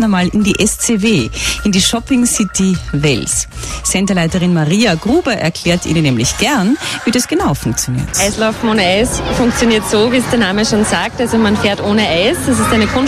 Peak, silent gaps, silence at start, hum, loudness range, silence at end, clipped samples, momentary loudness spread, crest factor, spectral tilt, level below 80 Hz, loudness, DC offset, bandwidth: 0 dBFS; none; 0 s; none; 1 LU; 0 s; under 0.1%; 4 LU; 12 dB; -4 dB/octave; -30 dBFS; -13 LUFS; under 0.1%; 14.5 kHz